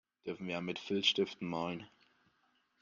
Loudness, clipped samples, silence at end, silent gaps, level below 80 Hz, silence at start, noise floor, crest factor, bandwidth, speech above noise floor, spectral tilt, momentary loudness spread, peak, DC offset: -36 LUFS; under 0.1%; 0.95 s; none; -78 dBFS; 0.25 s; -76 dBFS; 24 dB; 7.6 kHz; 39 dB; -4.5 dB/octave; 13 LU; -16 dBFS; under 0.1%